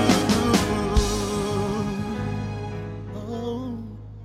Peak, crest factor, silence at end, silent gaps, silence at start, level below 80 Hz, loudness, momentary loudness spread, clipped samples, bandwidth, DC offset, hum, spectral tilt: -6 dBFS; 18 dB; 0 s; none; 0 s; -34 dBFS; -25 LUFS; 14 LU; under 0.1%; 16 kHz; under 0.1%; none; -5 dB/octave